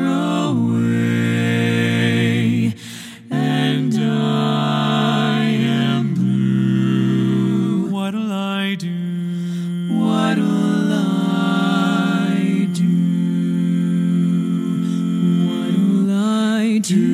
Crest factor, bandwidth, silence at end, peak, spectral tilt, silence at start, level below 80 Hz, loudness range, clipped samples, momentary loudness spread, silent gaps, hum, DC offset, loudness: 14 dB; 13.5 kHz; 0 s; -4 dBFS; -6.5 dB/octave; 0 s; -66 dBFS; 2 LU; under 0.1%; 5 LU; none; none; under 0.1%; -18 LUFS